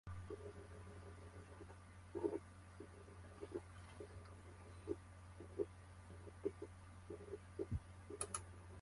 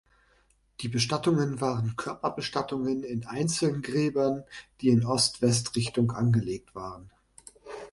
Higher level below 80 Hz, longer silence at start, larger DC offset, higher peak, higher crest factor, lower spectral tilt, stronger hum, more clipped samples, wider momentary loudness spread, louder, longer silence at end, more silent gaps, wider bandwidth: about the same, -62 dBFS vs -60 dBFS; second, 0.05 s vs 0.8 s; neither; second, -26 dBFS vs -10 dBFS; first, 26 dB vs 18 dB; about the same, -5.5 dB/octave vs -5 dB/octave; neither; neither; second, 12 LU vs 16 LU; second, -52 LUFS vs -28 LUFS; about the same, 0 s vs 0 s; neither; about the same, 11.5 kHz vs 11.5 kHz